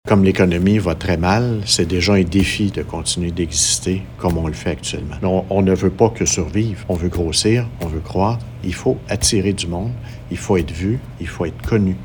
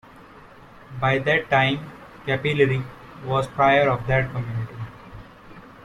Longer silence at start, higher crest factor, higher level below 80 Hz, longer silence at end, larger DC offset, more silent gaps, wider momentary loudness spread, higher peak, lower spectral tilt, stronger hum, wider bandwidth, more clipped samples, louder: second, 0.05 s vs 0.2 s; about the same, 18 dB vs 18 dB; first, -34 dBFS vs -48 dBFS; about the same, 0 s vs 0.05 s; neither; neither; second, 10 LU vs 19 LU; first, 0 dBFS vs -4 dBFS; second, -4.5 dB/octave vs -7 dB/octave; neither; first, 19 kHz vs 11 kHz; neither; first, -18 LUFS vs -22 LUFS